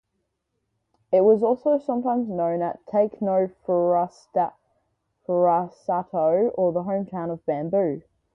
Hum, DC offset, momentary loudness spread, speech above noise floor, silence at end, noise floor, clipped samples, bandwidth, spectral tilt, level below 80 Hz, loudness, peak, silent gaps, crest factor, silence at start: none; under 0.1%; 8 LU; 54 dB; 0.35 s; -77 dBFS; under 0.1%; 6.4 kHz; -10 dB/octave; -66 dBFS; -23 LUFS; -8 dBFS; none; 16 dB; 1.1 s